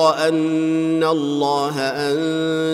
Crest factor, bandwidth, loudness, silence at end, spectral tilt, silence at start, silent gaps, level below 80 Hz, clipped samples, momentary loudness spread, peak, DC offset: 14 dB; 14 kHz; -19 LUFS; 0 s; -5.5 dB/octave; 0 s; none; -66 dBFS; under 0.1%; 2 LU; -4 dBFS; under 0.1%